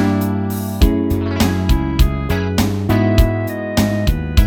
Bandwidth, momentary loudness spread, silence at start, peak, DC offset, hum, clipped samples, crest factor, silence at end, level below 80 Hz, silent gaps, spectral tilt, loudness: 18.5 kHz; 5 LU; 0 s; 0 dBFS; under 0.1%; none; under 0.1%; 14 dB; 0 s; -20 dBFS; none; -6.5 dB/octave; -17 LUFS